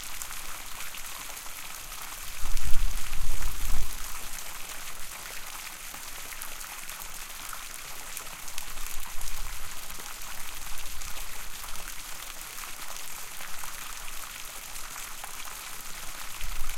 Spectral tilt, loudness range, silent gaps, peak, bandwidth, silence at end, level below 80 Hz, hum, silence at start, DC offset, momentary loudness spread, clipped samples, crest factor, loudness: -1 dB/octave; 2 LU; none; -4 dBFS; 16.5 kHz; 0 s; -36 dBFS; none; 0 s; under 0.1%; 3 LU; under 0.1%; 22 dB; -38 LUFS